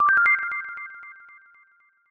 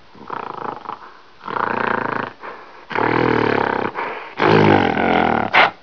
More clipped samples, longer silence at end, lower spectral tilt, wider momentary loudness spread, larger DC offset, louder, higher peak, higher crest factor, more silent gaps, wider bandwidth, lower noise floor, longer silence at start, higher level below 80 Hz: neither; first, 1 s vs 0.1 s; second, -2.5 dB/octave vs -7 dB/octave; first, 24 LU vs 19 LU; second, under 0.1% vs 0.4%; second, -21 LUFS vs -18 LUFS; second, -8 dBFS vs 0 dBFS; about the same, 18 dB vs 18 dB; neither; first, 7 kHz vs 5.4 kHz; first, -60 dBFS vs -42 dBFS; second, 0 s vs 0.2 s; second, -70 dBFS vs -52 dBFS